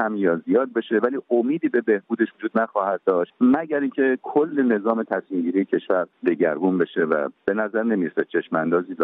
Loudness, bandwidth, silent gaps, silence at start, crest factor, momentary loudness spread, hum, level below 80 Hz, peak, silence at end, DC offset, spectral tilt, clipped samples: -22 LUFS; 3.9 kHz; none; 0 s; 16 dB; 4 LU; none; -70 dBFS; -4 dBFS; 0 s; under 0.1%; -10 dB/octave; under 0.1%